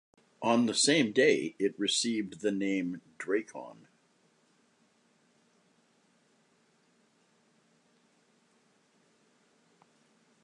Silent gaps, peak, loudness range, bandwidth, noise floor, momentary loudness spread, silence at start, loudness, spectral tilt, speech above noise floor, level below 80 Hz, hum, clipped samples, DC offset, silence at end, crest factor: none; -12 dBFS; 14 LU; 11.5 kHz; -69 dBFS; 15 LU; 0.4 s; -29 LUFS; -3 dB/octave; 40 dB; -82 dBFS; none; under 0.1%; under 0.1%; 6.7 s; 22 dB